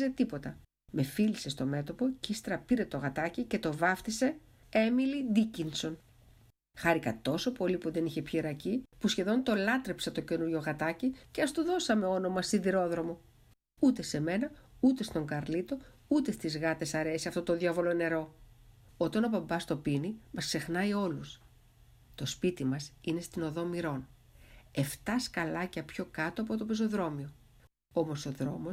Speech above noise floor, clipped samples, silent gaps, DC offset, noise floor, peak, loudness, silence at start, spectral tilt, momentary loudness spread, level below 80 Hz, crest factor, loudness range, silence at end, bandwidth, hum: 32 dB; under 0.1%; none; under 0.1%; -64 dBFS; -14 dBFS; -33 LUFS; 0 s; -5.5 dB/octave; 8 LU; -60 dBFS; 20 dB; 4 LU; 0 s; 16 kHz; none